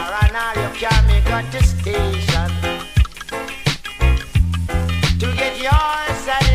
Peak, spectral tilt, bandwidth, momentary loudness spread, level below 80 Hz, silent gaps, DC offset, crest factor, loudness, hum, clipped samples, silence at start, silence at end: -2 dBFS; -5 dB/octave; 15.5 kHz; 6 LU; -20 dBFS; none; under 0.1%; 16 dB; -19 LUFS; none; under 0.1%; 0 s; 0 s